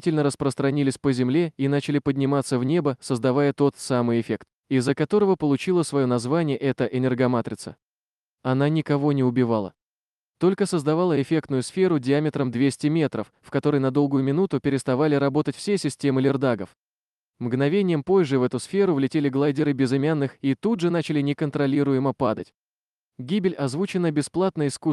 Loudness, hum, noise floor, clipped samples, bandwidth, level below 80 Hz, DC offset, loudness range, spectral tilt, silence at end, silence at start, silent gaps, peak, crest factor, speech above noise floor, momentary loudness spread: -23 LUFS; none; under -90 dBFS; under 0.1%; 12 kHz; -64 dBFS; under 0.1%; 2 LU; -7 dB/octave; 0 s; 0.05 s; 4.55-4.63 s, 7.83-8.38 s, 9.82-10.33 s, 16.76-17.33 s, 22.54-23.12 s; -10 dBFS; 14 dB; over 68 dB; 5 LU